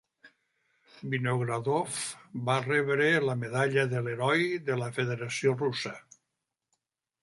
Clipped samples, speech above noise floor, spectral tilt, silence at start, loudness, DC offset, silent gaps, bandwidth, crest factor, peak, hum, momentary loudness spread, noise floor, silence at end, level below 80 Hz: under 0.1%; 56 dB; -5 dB/octave; 0.25 s; -29 LUFS; under 0.1%; none; 11.5 kHz; 18 dB; -12 dBFS; none; 10 LU; -85 dBFS; 1.25 s; -72 dBFS